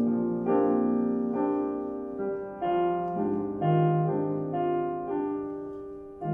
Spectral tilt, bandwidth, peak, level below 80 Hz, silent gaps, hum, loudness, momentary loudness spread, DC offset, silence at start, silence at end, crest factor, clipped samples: -11.5 dB/octave; 3.4 kHz; -14 dBFS; -62 dBFS; none; none; -28 LUFS; 10 LU; under 0.1%; 0 s; 0 s; 14 dB; under 0.1%